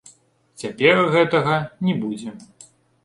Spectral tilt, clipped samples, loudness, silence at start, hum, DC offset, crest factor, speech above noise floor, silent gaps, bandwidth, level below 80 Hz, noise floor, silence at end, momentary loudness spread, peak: -6 dB/octave; under 0.1%; -19 LUFS; 0.6 s; none; under 0.1%; 20 dB; 35 dB; none; 11.5 kHz; -62 dBFS; -55 dBFS; 0.6 s; 17 LU; -2 dBFS